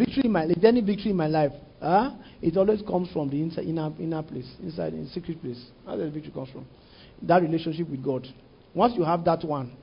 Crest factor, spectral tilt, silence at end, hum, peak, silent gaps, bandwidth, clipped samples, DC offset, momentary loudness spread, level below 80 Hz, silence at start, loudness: 20 dB; -11.5 dB/octave; 0.05 s; none; -6 dBFS; none; 5.4 kHz; under 0.1%; under 0.1%; 15 LU; -54 dBFS; 0 s; -26 LUFS